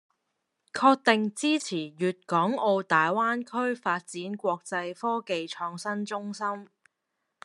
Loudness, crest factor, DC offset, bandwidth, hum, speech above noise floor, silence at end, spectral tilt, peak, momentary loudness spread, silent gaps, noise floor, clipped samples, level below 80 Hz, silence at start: -27 LUFS; 24 dB; under 0.1%; 12 kHz; none; 54 dB; 0.8 s; -4.5 dB/octave; -4 dBFS; 10 LU; none; -81 dBFS; under 0.1%; -84 dBFS; 0.75 s